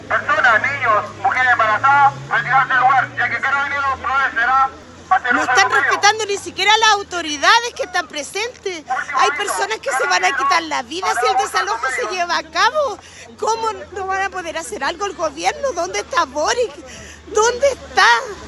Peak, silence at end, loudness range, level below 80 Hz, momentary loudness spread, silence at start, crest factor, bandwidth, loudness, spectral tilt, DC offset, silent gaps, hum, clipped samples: 0 dBFS; 0 s; 6 LU; -50 dBFS; 10 LU; 0 s; 18 dB; 12.5 kHz; -17 LUFS; -1.5 dB/octave; under 0.1%; none; none; under 0.1%